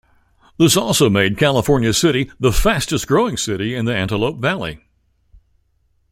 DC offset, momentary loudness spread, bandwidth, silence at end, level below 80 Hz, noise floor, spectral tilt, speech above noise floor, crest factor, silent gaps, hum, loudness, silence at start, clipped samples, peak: under 0.1%; 7 LU; 16 kHz; 1.35 s; -32 dBFS; -62 dBFS; -4.5 dB/octave; 46 dB; 16 dB; none; none; -17 LUFS; 0.6 s; under 0.1%; -2 dBFS